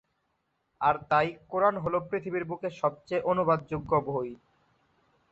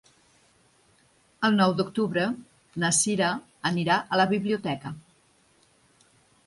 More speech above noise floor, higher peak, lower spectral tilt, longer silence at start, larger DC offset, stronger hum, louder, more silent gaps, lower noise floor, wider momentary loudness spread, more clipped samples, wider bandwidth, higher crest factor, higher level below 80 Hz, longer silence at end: first, 48 dB vs 38 dB; about the same, -10 dBFS vs -10 dBFS; first, -8 dB/octave vs -4 dB/octave; second, 0.8 s vs 1.4 s; neither; neither; second, -29 LUFS vs -25 LUFS; neither; first, -77 dBFS vs -63 dBFS; second, 8 LU vs 13 LU; neither; second, 8 kHz vs 11.5 kHz; about the same, 20 dB vs 18 dB; first, -60 dBFS vs -66 dBFS; second, 0.95 s vs 1.45 s